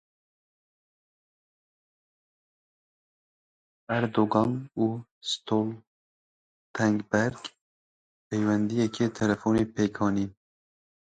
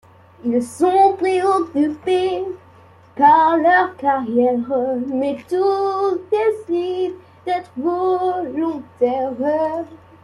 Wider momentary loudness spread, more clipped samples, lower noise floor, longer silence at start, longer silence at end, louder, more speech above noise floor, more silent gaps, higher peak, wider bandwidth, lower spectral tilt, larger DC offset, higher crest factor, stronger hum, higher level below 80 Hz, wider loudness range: about the same, 10 LU vs 11 LU; neither; first, under -90 dBFS vs -47 dBFS; first, 3.9 s vs 0.45 s; first, 0.7 s vs 0.25 s; second, -28 LUFS vs -18 LUFS; first, over 63 dB vs 29 dB; first, 5.11-5.21 s, 5.87-6.74 s, 7.61-8.31 s vs none; second, -8 dBFS vs -2 dBFS; second, 9.2 kHz vs 12 kHz; about the same, -6 dB/octave vs -5.5 dB/octave; neither; first, 22 dB vs 16 dB; neither; about the same, -60 dBFS vs -64 dBFS; about the same, 4 LU vs 5 LU